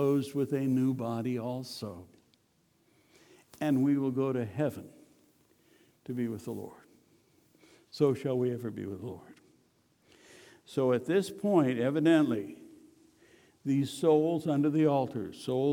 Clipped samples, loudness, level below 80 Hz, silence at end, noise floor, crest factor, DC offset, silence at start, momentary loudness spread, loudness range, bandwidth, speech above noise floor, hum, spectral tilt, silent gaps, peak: under 0.1%; -30 LUFS; -76 dBFS; 0 s; -70 dBFS; 18 dB; under 0.1%; 0 s; 16 LU; 7 LU; 18.5 kHz; 41 dB; none; -7.5 dB/octave; none; -12 dBFS